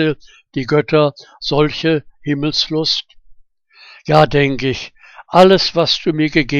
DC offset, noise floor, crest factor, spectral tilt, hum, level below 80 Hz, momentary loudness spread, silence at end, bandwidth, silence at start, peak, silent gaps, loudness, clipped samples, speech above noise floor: under 0.1%; -47 dBFS; 16 dB; -5.5 dB/octave; none; -40 dBFS; 14 LU; 0 s; 10 kHz; 0 s; 0 dBFS; none; -15 LUFS; under 0.1%; 32 dB